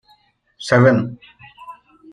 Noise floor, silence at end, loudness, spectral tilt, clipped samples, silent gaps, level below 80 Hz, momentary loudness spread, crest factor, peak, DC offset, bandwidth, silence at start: -57 dBFS; 0.4 s; -16 LUFS; -7 dB/octave; under 0.1%; none; -54 dBFS; 26 LU; 18 dB; -2 dBFS; under 0.1%; 10.5 kHz; 0.6 s